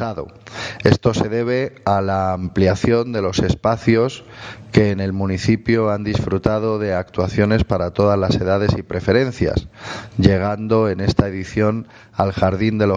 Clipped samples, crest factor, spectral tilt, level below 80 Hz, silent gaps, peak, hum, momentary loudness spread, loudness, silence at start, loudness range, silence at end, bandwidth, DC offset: under 0.1%; 18 dB; -7 dB/octave; -38 dBFS; none; 0 dBFS; none; 9 LU; -18 LUFS; 0 s; 1 LU; 0 s; 9.4 kHz; under 0.1%